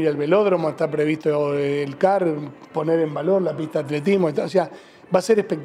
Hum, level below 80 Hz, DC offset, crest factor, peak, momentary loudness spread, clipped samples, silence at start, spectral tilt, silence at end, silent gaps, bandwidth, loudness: none; -68 dBFS; under 0.1%; 16 dB; -6 dBFS; 6 LU; under 0.1%; 0 s; -7 dB/octave; 0 s; none; 13.5 kHz; -21 LUFS